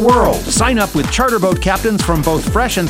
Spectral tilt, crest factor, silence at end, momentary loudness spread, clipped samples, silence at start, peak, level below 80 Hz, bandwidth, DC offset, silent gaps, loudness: -4.5 dB/octave; 14 dB; 0 s; 3 LU; under 0.1%; 0 s; 0 dBFS; -24 dBFS; 16.5 kHz; under 0.1%; none; -14 LUFS